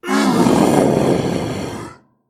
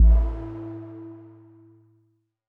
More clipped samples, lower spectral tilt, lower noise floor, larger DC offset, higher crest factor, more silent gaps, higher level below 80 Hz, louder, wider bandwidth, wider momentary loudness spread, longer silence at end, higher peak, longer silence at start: neither; second, -6 dB/octave vs -11.5 dB/octave; second, -36 dBFS vs -68 dBFS; neither; about the same, 16 dB vs 16 dB; neither; second, -44 dBFS vs -24 dBFS; first, -16 LUFS vs -27 LUFS; first, 16 kHz vs 1.8 kHz; second, 16 LU vs 24 LU; second, 0.35 s vs 1.35 s; first, 0 dBFS vs -8 dBFS; about the same, 0.05 s vs 0 s